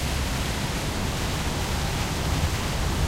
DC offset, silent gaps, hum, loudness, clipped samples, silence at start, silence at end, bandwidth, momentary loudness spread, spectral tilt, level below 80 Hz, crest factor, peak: under 0.1%; none; none; -27 LUFS; under 0.1%; 0 s; 0 s; 16 kHz; 2 LU; -4 dB/octave; -30 dBFS; 14 dB; -12 dBFS